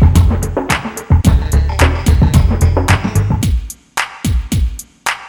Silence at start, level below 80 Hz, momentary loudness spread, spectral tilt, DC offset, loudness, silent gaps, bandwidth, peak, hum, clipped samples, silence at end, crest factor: 0 s; -16 dBFS; 9 LU; -5.5 dB/octave; under 0.1%; -14 LUFS; none; 19 kHz; 0 dBFS; none; 0.1%; 0 s; 12 dB